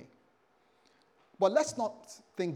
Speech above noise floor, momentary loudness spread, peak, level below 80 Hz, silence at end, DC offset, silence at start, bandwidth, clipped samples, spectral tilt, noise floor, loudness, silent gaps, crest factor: 38 dB; 18 LU; -14 dBFS; -84 dBFS; 0 s; under 0.1%; 0 s; 12.5 kHz; under 0.1%; -4.5 dB/octave; -69 dBFS; -31 LUFS; none; 22 dB